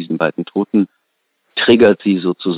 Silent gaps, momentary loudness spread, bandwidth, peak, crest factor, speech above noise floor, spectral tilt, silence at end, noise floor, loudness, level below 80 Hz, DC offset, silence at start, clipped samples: none; 11 LU; 4.9 kHz; 0 dBFS; 16 dB; 54 dB; -8.5 dB/octave; 0 s; -68 dBFS; -15 LUFS; -58 dBFS; under 0.1%; 0 s; under 0.1%